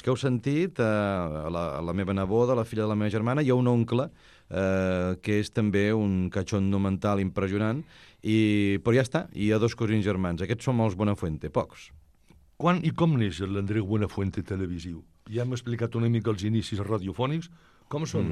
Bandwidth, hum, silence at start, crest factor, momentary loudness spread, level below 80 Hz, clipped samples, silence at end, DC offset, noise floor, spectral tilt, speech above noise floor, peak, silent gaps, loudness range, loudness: 12 kHz; none; 0.05 s; 16 dB; 8 LU; -52 dBFS; under 0.1%; 0 s; under 0.1%; -59 dBFS; -7.5 dB/octave; 32 dB; -10 dBFS; none; 4 LU; -27 LUFS